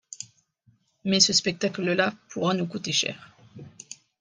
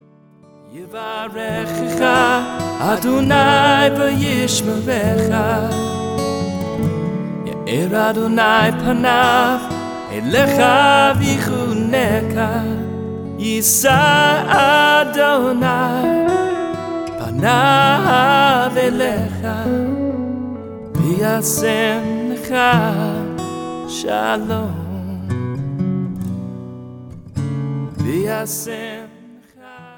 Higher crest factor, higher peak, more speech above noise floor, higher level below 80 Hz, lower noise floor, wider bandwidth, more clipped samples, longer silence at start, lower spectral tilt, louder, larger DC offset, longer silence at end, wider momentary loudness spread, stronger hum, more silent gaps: first, 24 dB vs 16 dB; second, -4 dBFS vs 0 dBFS; first, 40 dB vs 32 dB; second, -70 dBFS vs -46 dBFS; first, -65 dBFS vs -47 dBFS; second, 10.5 kHz vs 19.5 kHz; neither; second, 0.1 s vs 0.7 s; second, -3 dB/octave vs -4.5 dB/octave; second, -24 LUFS vs -16 LUFS; neither; first, 0.25 s vs 0.05 s; first, 24 LU vs 14 LU; neither; neither